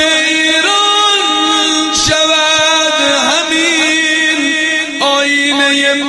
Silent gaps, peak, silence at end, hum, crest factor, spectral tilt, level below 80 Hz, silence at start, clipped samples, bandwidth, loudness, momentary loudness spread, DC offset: none; 0 dBFS; 0 s; none; 12 dB; -1 dB/octave; -46 dBFS; 0 s; under 0.1%; 11.5 kHz; -9 LUFS; 3 LU; under 0.1%